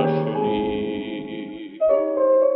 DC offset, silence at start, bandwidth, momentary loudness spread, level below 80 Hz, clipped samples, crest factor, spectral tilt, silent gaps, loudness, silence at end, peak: under 0.1%; 0 s; 5.2 kHz; 14 LU; -54 dBFS; under 0.1%; 14 dB; -6 dB/octave; none; -22 LUFS; 0 s; -8 dBFS